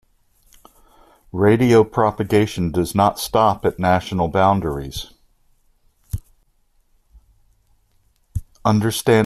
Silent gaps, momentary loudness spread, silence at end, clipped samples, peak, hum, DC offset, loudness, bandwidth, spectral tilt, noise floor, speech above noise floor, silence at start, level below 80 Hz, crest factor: none; 18 LU; 0 s; under 0.1%; -2 dBFS; none; under 0.1%; -18 LUFS; 14 kHz; -6 dB/octave; -61 dBFS; 44 dB; 1.35 s; -42 dBFS; 18 dB